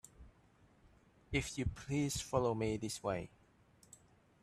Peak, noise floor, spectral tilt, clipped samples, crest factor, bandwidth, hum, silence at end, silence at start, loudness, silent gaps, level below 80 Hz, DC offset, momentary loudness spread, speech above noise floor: -20 dBFS; -68 dBFS; -5 dB/octave; under 0.1%; 22 dB; 13 kHz; none; 1.15 s; 0.2 s; -39 LUFS; none; -56 dBFS; under 0.1%; 24 LU; 30 dB